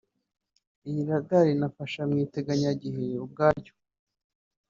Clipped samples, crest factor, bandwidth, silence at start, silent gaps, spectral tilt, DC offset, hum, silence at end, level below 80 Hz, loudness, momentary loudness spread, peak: under 0.1%; 22 dB; 7.4 kHz; 0.85 s; none; -6.5 dB/octave; under 0.1%; none; 1.05 s; -60 dBFS; -28 LUFS; 10 LU; -8 dBFS